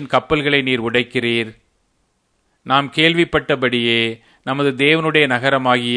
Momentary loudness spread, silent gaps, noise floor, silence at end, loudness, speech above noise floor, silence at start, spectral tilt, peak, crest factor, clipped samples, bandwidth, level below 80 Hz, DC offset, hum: 7 LU; none; -65 dBFS; 0 s; -16 LUFS; 48 dB; 0 s; -5.5 dB/octave; 0 dBFS; 18 dB; under 0.1%; 10.5 kHz; -48 dBFS; under 0.1%; none